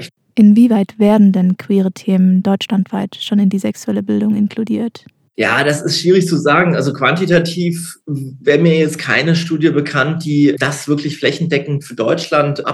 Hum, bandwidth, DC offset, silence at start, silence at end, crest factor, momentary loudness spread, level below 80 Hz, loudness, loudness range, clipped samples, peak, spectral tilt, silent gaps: none; 12.5 kHz; under 0.1%; 0 s; 0 s; 12 dB; 9 LU; -58 dBFS; -14 LUFS; 3 LU; under 0.1%; 0 dBFS; -6 dB/octave; none